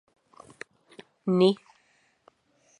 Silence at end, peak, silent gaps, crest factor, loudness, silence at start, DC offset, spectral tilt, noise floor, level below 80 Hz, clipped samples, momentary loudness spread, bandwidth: 1.25 s; -8 dBFS; none; 22 dB; -25 LUFS; 1.25 s; under 0.1%; -7.5 dB/octave; -67 dBFS; -78 dBFS; under 0.1%; 23 LU; 10.5 kHz